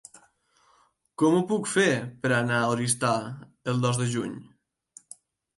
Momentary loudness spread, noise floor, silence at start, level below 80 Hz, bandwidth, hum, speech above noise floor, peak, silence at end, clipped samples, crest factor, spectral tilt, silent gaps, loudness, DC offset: 18 LU; -65 dBFS; 1.2 s; -68 dBFS; 11.5 kHz; none; 39 dB; -10 dBFS; 1.15 s; under 0.1%; 18 dB; -5 dB/octave; none; -26 LUFS; under 0.1%